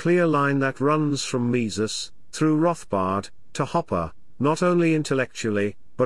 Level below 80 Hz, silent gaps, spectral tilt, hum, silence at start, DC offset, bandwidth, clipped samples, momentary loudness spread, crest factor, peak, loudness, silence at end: -58 dBFS; none; -5.5 dB/octave; none; 0 s; 0.8%; 12 kHz; under 0.1%; 9 LU; 14 dB; -8 dBFS; -23 LUFS; 0 s